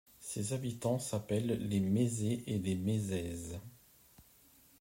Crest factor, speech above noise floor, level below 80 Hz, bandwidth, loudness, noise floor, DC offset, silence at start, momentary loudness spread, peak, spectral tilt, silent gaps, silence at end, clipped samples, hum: 16 dB; 29 dB; -66 dBFS; 16 kHz; -36 LUFS; -64 dBFS; under 0.1%; 0.2 s; 11 LU; -20 dBFS; -6 dB/octave; none; 0.6 s; under 0.1%; none